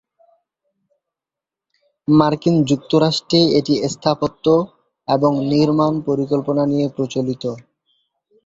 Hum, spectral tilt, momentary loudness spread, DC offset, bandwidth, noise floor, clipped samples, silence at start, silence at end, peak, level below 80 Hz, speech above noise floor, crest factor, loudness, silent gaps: none; -6.5 dB/octave; 9 LU; under 0.1%; 7.8 kHz; -87 dBFS; under 0.1%; 2.1 s; 0.85 s; 0 dBFS; -56 dBFS; 71 dB; 18 dB; -17 LUFS; none